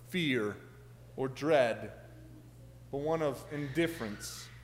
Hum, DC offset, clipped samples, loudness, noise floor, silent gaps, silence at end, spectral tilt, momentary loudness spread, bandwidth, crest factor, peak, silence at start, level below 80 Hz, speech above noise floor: none; under 0.1%; under 0.1%; -34 LUFS; -53 dBFS; none; 0 s; -5.5 dB/octave; 25 LU; 16 kHz; 20 dB; -14 dBFS; 0 s; -60 dBFS; 20 dB